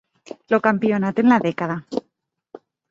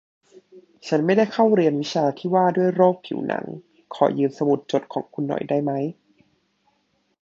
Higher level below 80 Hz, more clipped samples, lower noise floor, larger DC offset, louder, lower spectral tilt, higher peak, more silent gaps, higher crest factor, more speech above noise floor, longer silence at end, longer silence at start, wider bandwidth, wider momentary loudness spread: first, -64 dBFS vs -70 dBFS; neither; first, -73 dBFS vs -68 dBFS; neither; about the same, -20 LUFS vs -22 LUFS; about the same, -7.5 dB/octave vs -7 dB/octave; about the same, -2 dBFS vs -2 dBFS; neither; about the same, 20 dB vs 20 dB; first, 54 dB vs 47 dB; second, 0.9 s vs 1.3 s; first, 0.5 s vs 0.35 s; about the same, 7.4 kHz vs 7.6 kHz; first, 15 LU vs 12 LU